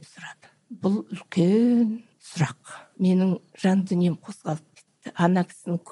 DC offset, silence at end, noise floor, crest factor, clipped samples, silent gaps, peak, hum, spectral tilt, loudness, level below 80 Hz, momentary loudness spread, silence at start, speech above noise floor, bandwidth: under 0.1%; 0.15 s; -45 dBFS; 16 dB; under 0.1%; none; -8 dBFS; none; -7.5 dB/octave; -24 LUFS; -72 dBFS; 21 LU; 0.2 s; 22 dB; 11.5 kHz